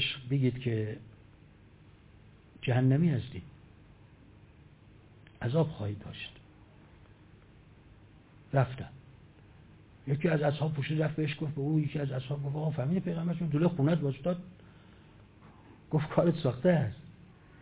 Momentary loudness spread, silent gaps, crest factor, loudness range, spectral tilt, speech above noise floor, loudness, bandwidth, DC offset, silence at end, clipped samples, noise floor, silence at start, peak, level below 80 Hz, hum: 16 LU; none; 20 dB; 7 LU; -6.5 dB/octave; 27 dB; -31 LUFS; 4 kHz; under 0.1%; 0.4 s; under 0.1%; -57 dBFS; 0 s; -12 dBFS; -60 dBFS; none